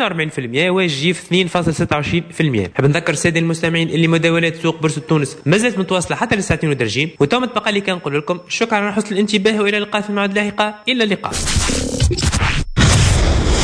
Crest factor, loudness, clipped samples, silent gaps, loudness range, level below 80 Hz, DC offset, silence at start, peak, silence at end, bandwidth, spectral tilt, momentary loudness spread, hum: 14 dB; -16 LUFS; under 0.1%; none; 1 LU; -26 dBFS; under 0.1%; 0 s; -2 dBFS; 0 s; 11 kHz; -4.5 dB/octave; 4 LU; none